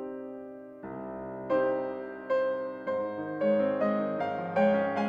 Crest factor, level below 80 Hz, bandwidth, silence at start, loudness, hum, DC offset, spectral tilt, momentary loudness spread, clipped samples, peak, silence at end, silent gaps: 16 dB; -68 dBFS; 5.4 kHz; 0 s; -30 LUFS; none; under 0.1%; -8.5 dB/octave; 15 LU; under 0.1%; -14 dBFS; 0 s; none